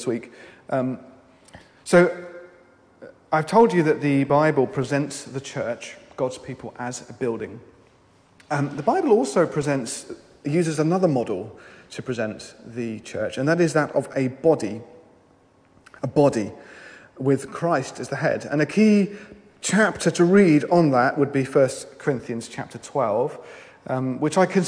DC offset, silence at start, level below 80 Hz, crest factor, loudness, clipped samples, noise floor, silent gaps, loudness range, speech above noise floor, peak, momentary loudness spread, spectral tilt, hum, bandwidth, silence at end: under 0.1%; 0 s; -62 dBFS; 18 dB; -22 LUFS; under 0.1%; -57 dBFS; none; 6 LU; 35 dB; -4 dBFS; 18 LU; -6 dB/octave; none; 10.5 kHz; 0 s